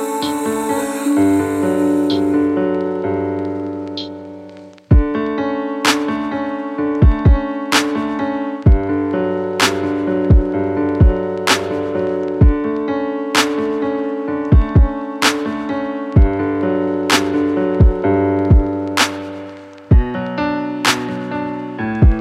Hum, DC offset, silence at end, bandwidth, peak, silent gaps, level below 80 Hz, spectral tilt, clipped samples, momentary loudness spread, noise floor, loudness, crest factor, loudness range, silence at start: none; under 0.1%; 0 s; 15.5 kHz; 0 dBFS; none; -22 dBFS; -5.5 dB/octave; under 0.1%; 9 LU; -37 dBFS; -17 LUFS; 16 dB; 3 LU; 0 s